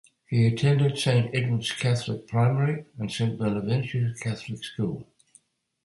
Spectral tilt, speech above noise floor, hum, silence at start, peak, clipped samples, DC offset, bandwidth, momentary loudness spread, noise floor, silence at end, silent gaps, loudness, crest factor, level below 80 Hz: -6.5 dB/octave; 36 dB; none; 0.3 s; -10 dBFS; under 0.1%; under 0.1%; 11.5 kHz; 10 LU; -61 dBFS; 0.8 s; none; -26 LUFS; 16 dB; -58 dBFS